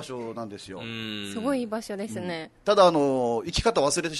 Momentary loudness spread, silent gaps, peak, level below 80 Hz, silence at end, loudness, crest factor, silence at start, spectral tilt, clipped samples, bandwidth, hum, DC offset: 16 LU; none; -6 dBFS; -48 dBFS; 0 s; -26 LUFS; 20 dB; 0 s; -4 dB/octave; under 0.1%; 12.5 kHz; none; under 0.1%